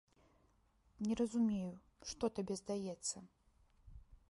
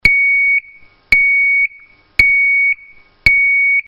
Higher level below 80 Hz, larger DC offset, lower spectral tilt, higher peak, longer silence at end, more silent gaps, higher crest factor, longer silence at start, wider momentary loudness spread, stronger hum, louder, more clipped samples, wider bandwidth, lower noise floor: second, -66 dBFS vs -36 dBFS; neither; first, -5 dB/octave vs -2.5 dB/octave; second, -24 dBFS vs 0 dBFS; about the same, 0.15 s vs 0.05 s; neither; about the same, 18 dB vs 14 dB; first, 1 s vs 0.05 s; first, 13 LU vs 7 LU; neither; second, -41 LUFS vs -11 LUFS; second, under 0.1% vs 0.1%; about the same, 11.5 kHz vs 11 kHz; first, -74 dBFS vs -44 dBFS